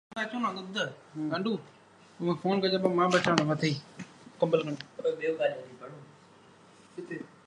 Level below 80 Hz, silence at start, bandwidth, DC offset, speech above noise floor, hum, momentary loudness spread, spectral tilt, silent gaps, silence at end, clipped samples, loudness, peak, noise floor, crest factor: -74 dBFS; 0.1 s; 11.5 kHz; under 0.1%; 27 dB; none; 22 LU; -5.5 dB/octave; none; 0.2 s; under 0.1%; -30 LUFS; -4 dBFS; -57 dBFS; 26 dB